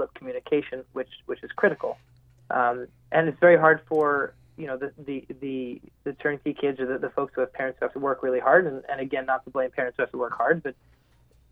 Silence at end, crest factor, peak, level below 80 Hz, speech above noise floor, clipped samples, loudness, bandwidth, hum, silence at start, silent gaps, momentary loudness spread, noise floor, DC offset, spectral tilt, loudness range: 0.8 s; 22 dB; -4 dBFS; -64 dBFS; 34 dB; under 0.1%; -25 LUFS; 4 kHz; none; 0 s; none; 16 LU; -60 dBFS; under 0.1%; -8.5 dB/octave; 7 LU